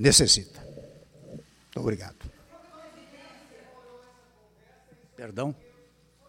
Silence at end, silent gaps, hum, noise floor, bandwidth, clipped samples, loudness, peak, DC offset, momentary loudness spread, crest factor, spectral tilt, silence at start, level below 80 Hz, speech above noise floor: 0.75 s; none; none; -60 dBFS; 16.5 kHz; under 0.1%; -24 LUFS; -4 dBFS; under 0.1%; 29 LU; 28 dB; -3 dB/octave; 0 s; -50 dBFS; 36 dB